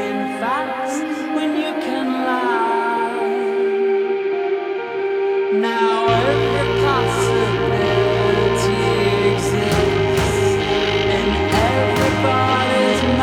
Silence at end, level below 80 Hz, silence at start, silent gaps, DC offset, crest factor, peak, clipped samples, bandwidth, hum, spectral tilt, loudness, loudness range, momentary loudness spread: 0 s; -36 dBFS; 0 s; none; under 0.1%; 14 dB; -4 dBFS; under 0.1%; 15.5 kHz; none; -5.5 dB/octave; -18 LUFS; 3 LU; 5 LU